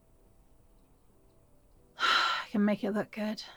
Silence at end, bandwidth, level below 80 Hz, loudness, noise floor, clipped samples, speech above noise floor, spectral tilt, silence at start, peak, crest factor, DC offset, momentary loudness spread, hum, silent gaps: 0 s; 19.5 kHz; -66 dBFS; -30 LUFS; -62 dBFS; under 0.1%; 31 dB; -4.5 dB/octave; 2 s; -14 dBFS; 20 dB; under 0.1%; 9 LU; none; none